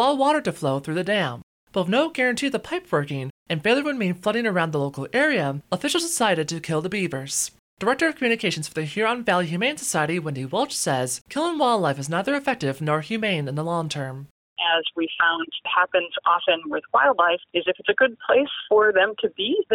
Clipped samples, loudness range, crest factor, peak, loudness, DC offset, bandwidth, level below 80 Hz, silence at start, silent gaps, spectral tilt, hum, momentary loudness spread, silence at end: under 0.1%; 4 LU; 16 dB; -8 dBFS; -23 LUFS; under 0.1%; 17 kHz; -64 dBFS; 0 s; 1.43-1.67 s, 3.30-3.46 s, 7.59-7.77 s, 11.21-11.25 s, 14.30-14.56 s; -4 dB/octave; none; 7 LU; 0 s